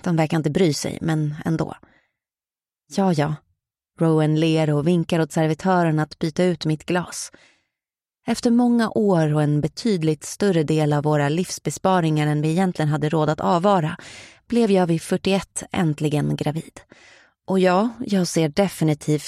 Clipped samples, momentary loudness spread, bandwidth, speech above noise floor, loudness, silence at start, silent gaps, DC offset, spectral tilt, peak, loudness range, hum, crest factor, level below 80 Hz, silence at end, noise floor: under 0.1%; 8 LU; 13.5 kHz; over 70 dB; -21 LUFS; 0.05 s; none; under 0.1%; -6.5 dB/octave; -2 dBFS; 3 LU; none; 18 dB; -56 dBFS; 0 s; under -90 dBFS